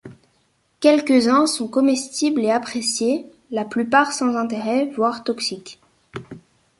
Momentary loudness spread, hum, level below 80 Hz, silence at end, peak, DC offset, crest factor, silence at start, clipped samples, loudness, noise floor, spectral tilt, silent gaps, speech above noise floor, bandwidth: 13 LU; none; -64 dBFS; 0.4 s; -2 dBFS; under 0.1%; 18 dB; 0.05 s; under 0.1%; -20 LUFS; -64 dBFS; -3.5 dB/octave; none; 45 dB; 11.5 kHz